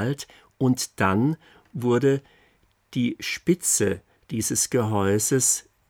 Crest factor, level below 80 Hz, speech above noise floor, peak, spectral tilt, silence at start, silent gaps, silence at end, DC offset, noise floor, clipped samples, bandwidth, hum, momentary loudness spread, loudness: 18 dB; -62 dBFS; 39 dB; -6 dBFS; -4.5 dB/octave; 0 s; none; 0.3 s; under 0.1%; -63 dBFS; under 0.1%; 18.5 kHz; none; 13 LU; -23 LUFS